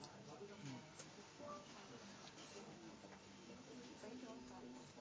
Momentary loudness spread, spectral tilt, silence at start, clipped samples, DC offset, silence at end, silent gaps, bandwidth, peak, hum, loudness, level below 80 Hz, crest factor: 4 LU; -4 dB/octave; 0 s; under 0.1%; under 0.1%; 0 s; none; 8 kHz; -38 dBFS; 50 Hz at -70 dBFS; -57 LUFS; -82 dBFS; 18 dB